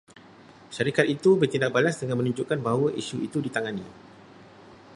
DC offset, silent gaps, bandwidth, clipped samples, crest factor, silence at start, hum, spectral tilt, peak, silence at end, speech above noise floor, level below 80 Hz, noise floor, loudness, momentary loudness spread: under 0.1%; none; 11.5 kHz; under 0.1%; 22 dB; 0.15 s; none; -6 dB/octave; -4 dBFS; 0 s; 26 dB; -66 dBFS; -50 dBFS; -25 LUFS; 11 LU